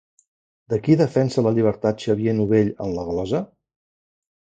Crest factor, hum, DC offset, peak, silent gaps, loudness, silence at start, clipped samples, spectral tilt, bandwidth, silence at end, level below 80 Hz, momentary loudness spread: 18 dB; none; under 0.1%; -4 dBFS; none; -21 LUFS; 0.7 s; under 0.1%; -8 dB/octave; 9 kHz; 1.15 s; -50 dBFS; 9 LU